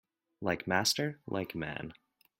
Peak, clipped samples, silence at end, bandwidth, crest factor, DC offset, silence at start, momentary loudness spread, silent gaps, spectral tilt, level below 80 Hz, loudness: -12 dBFS; under 0.1%; 0.5 s; 16.5 kHz; 24 dB; under 0.1%; 0.4 s; 12 LU; none; -3.5 dB/octave; -66 dBFS; -34 LUFS